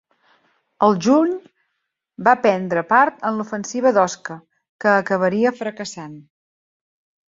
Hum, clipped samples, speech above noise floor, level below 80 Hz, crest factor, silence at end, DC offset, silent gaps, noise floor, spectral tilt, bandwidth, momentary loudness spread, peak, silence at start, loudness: none; under 0.1%; 58 dB; -66 dBFS; 18 dB; 1.1 s; under 0.1%; 4.69-4.79 s; -76 dBFS; -5.5 dB/octave; 7.8 kHz; 15 LU; -2 dBFS; 0.8 s; -18 LUFS